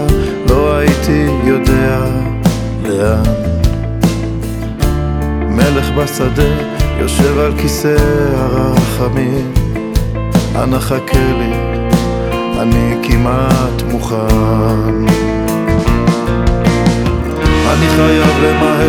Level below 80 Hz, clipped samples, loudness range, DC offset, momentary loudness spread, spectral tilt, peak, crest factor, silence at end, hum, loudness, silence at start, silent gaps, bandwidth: -18 dBFS; under 0.1%; 2 LU; under 0.1%; 5 LU; -6.5 dB/octave; 0 dBFS; 12 dB; 0 s; none; -13 LUFS; 0 s; none; over 20 kHz